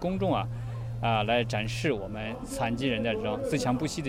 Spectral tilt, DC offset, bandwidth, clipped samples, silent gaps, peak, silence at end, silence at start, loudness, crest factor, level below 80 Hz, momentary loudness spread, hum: -5.5 dB/octave; under 0.1%; 15 kHz; under 0.1%; none; -12 dBFS; 0 s; 0 s; -30 LUFS; 16 dB; -46 dBFS; 9 LU; none